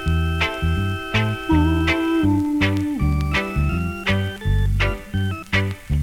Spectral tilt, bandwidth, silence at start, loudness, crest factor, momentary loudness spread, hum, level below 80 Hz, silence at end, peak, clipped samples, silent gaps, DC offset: -6.5 dB/octave; 16 kHz; 0 s; -21 LUFS; 14 dB; 4 LU; none; -28 dBFS; 0 s; -6 dBFS; under 0.1%; none; under 0.1%